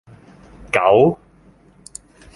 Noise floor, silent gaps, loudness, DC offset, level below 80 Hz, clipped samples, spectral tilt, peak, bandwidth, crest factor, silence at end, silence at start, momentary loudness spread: -50 dBFS; none; -16 LUFS; under 0.1%; -50 dBFS; under 0.1%; -6 dB/octave; 0 dBFS; 11.5 kHz; 20 dB; 1.2 s; 0.75 s; 25 LU